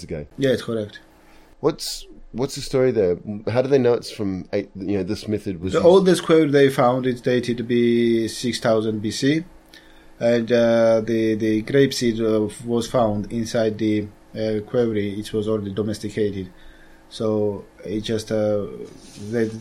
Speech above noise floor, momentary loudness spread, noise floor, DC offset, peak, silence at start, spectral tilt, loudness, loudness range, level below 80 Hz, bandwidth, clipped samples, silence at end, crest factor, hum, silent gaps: 28 dB; 12 LU; -49 dBFS; under 0.1%; -2 dBFS; 0 s; -6 dB/octave; -21 LUFS; 7 LU; -48 dBFS; 16 kHz; under 0.1%; 0 s; 18 dB; none; none